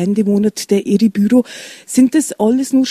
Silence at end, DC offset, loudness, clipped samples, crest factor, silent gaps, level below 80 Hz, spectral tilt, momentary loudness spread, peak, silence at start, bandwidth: 0 s; under 0.1%; -14 LUFS; under 0.1%; 12 dB; none; -56 dBFS; -5.5 dB/octave; 5 LU; -2 dBFS; 0 s; 14.5 kHz